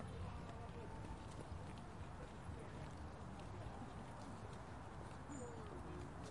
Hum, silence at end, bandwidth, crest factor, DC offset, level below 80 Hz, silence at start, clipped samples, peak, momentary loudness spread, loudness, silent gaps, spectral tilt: none; 0 s; 11.5 kHz; 16 dB; under 0.1%; -60 dBFS; 0 s; under 0.1%; -36 dBFS; 2 LU; -53 LUFS; none; -6 dB/octave